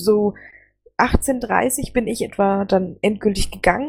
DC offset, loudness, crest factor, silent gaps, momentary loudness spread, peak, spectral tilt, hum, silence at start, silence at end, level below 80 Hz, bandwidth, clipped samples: under 0.1%; -20 LUFS; 18 dB; none; 4 LU; -2 dBFS; -5 dB/octave; none; 0 s; 0 s; -32 dBFS; 19.5 kHz; under 0.1%